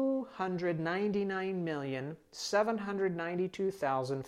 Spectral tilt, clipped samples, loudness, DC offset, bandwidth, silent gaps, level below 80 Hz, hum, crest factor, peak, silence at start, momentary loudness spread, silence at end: -5.5 dB/octave; under 0.1%; -34 LUFS; under 0.1%; 14 kHz; none; -72 dBFS; none; 18 dB; -16 dBFS; 0 s; 6 LU; 0 s